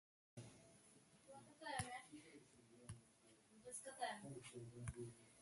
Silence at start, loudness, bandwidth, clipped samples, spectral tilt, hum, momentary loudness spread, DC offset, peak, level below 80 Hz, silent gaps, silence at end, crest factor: 0.35 s; -55 LUFS; 11.5 kHz; under 0.1%; -4 dB/octave; none; 18 LU; under 0.1%; -30 dBFS; -72 dBFS; none; 0 s; 26 dB